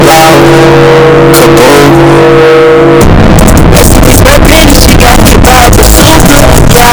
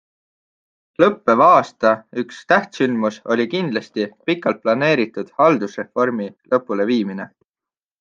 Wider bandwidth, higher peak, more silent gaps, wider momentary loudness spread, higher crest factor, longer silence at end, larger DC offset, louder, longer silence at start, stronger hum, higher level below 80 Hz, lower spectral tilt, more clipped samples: first, over 20 kHz vs 7.6 kHz; about the same, 0 dBFS vs -2 dBFS; neither; second, 1 LU vs 12 LU; second, 0 dB vs 18 dB; second, 0 s vs 0.75 s; neither; first, -1 LUFS vs -18 LUFS; second, 0 s vs 1 s; neither; first, -8 dBFS vs -66 dBFS; second, -4.5 dB/octave vs -6 dB/octave; first, 90% vs under 0.1%